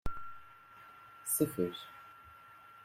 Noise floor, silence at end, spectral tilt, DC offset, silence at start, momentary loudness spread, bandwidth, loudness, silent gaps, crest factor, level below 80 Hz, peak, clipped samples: -57 dBFS; 0 s; -4.5 dB/octave; under 0.1%; 0.05 s; 23 LU; 16 kHz; -36 LUFS; none; 24 dB; -56 dBFS; -16 dBFS; under 0.1%